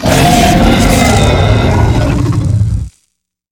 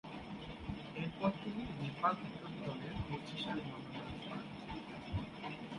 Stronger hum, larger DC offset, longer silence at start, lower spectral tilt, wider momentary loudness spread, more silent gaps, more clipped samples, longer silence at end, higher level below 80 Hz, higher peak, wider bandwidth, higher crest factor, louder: neither; neither; about the same, 0 s vs 0.05 s; second, -5.5 dB/octave vs -7 dB/octave; second, 7 LU vs 10 LU; neither; first, 0.8% vs under 0.1%; first, 0.6 s vs 0 s; first, -18 dBFS vs -58 dBFS; first, 0 dBFS vs -20 dBFS; first, 19.5 kHz vs 11 kHz; second, 10 dB vs 22 dB; first, -9 LUFS vs -43 LUFS